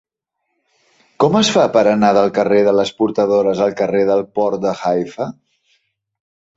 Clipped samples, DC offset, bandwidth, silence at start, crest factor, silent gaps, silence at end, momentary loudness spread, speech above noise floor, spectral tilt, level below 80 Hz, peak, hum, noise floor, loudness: under 0.1%; under 0.1%; 8 kHz; 1.2 s; 16 dB; none; 1.25 s; 7 LU; 60 dB; -5 dB/octave; -58 dBFS; -2 dBFS; none; -74 dBFS; -15 LUFS